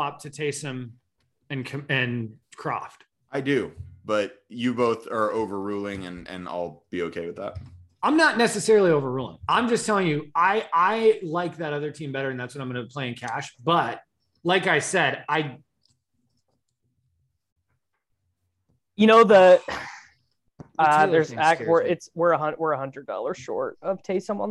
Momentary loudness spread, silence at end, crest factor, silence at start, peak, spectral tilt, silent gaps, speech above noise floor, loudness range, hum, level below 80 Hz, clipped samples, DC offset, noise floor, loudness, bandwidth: 15 LU; 0 s; 20 dB; 0 s; -4 dBFS; -5 dB/octave; 17.52-17.56 s; 54 dB; 10 LU; none; -62 dBFS; under 0.1%; under 0.1%; -77 dBFS; -23 LUFS; 12.5 kHz